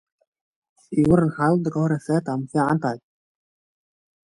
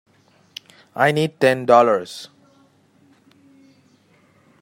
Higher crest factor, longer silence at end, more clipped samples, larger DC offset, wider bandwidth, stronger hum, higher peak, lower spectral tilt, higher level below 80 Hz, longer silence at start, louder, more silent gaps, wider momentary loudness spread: about the same, 20 dB vs 22 dB; second, 1.25 s vs 2.35 s; neither; neither; second, 11.5 kHz vs 16 kHz; neither; about the same, -4 dBFS vs -2 dBFS; first, -8.5 dB/octave vs -5.5 dB/octave; first, -52 dBFS vs -68 dBFS; about the same, 0.9 s vs 0.95 s; second, -22 LUFS vs -17 LUFS; neither; second, 8 LU vs 25 LU